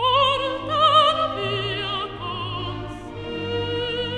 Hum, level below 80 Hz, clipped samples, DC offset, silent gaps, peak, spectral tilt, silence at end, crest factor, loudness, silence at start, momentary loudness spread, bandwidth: none; -46 dBFS; under 0.1%; under 0.1%; none; -6 dBFS; -5 dB/octave; 0 s; 16 dB; -22 LUFS; 0 s; 15 LU; 10 kHz